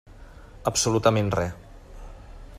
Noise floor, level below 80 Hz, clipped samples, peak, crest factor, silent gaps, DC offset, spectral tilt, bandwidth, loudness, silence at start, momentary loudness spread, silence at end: -45 dBFS; -44 dBFS; under 0.1%; -4 dBFS; 22 dB; none; under 0.1%; -4.5 dB/octave; 15.5 kHz; -24 LUFS; 0.1 s; 25 LU; 0 s